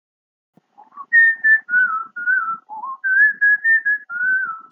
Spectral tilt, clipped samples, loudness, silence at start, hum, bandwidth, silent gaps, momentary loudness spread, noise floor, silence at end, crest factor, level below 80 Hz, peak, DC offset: -4 dB/octave; under 0.1%; -16 LUFS; 0.95 s; none; 3.9 kHz; none; 11 LU; -41 dBFS; 0.1 s; 14 dB; under -90 dBFS; -6 dBFS; under 0.1%